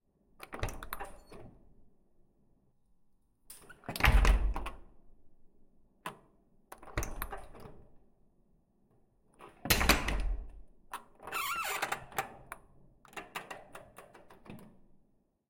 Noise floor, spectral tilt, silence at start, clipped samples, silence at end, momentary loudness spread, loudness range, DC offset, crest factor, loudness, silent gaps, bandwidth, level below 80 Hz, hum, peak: -70 dBFS; -3.5 dB/octave; 0.4 s; under 0.1%; 0.8 s; 26 LU; 14 LU; under 0.1%; 30 dB; -34 LUFS; none; 16.5 kHz; -40 dBFS; none; -8 dBFS